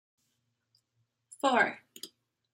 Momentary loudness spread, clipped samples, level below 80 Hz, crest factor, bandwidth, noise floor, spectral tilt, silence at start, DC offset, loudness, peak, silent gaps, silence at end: 21 LU; under 0.1%; -86 dBFS; 24 dB; 16 kHz; -80 dBFS; -3 dB/octave; 1.45 s; under 0.1%; -29 LUFS; -12 dBFS; none; 0.5 s